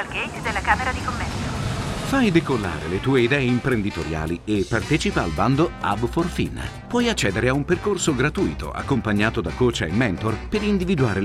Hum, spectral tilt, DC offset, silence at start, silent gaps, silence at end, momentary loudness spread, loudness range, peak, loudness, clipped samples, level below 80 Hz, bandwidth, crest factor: none; -5.5 dB/octave; under 0.1%; 0 s; none; 0 s; 7 LU; 1 LU; -4 dBFS; -22 LUFS; under 0.1%; -36 dBFS; 15 kHz; 18 dB